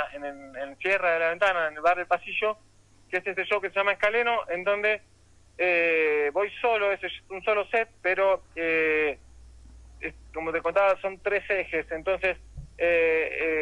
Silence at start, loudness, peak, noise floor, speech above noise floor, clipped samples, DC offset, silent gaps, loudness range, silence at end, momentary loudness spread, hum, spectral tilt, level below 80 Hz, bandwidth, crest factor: 0 s; -26 LUFS; -12 dBFS; -49 dBFS; 23 dB; under 0.1%; under 0.1%; none; 2 LU; 0 s; 12 LU; none; -4.5 dB/octave; -54 dBFS; 11 kHz; 14 dB